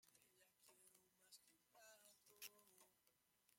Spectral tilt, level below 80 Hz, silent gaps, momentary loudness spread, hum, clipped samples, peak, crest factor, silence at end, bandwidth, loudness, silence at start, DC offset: 0 dB/octave; under -90 dBFS; none; 8 LU; none; under 0.1%; -42 dBFS; 28 dB; 0 s; 16.5 kHz; -64 LUFS; 0 s; under 0.1%